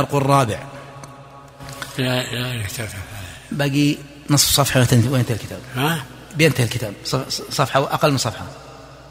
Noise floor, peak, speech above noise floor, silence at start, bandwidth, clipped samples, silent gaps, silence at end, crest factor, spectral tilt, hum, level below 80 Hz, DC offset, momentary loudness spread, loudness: -41 dBFS; 0 dBFS; 22 dB; 0 s; 16 kHz; under 0.1%; none; 0 s; 20 dB; -4.5 dB/octave; none; -46 dBFS; under 0.1%; 20 LU; -19 LUFS